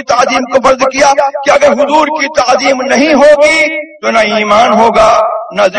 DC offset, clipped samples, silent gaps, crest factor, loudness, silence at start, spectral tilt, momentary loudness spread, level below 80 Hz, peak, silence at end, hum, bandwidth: under 0.1%; 2%; none; 8 dB; -8 LUFS; 0 s; -3 dB/octave; 5 LU; -40 dBFS; 0 dBFS; 0 s; none; 11 kHz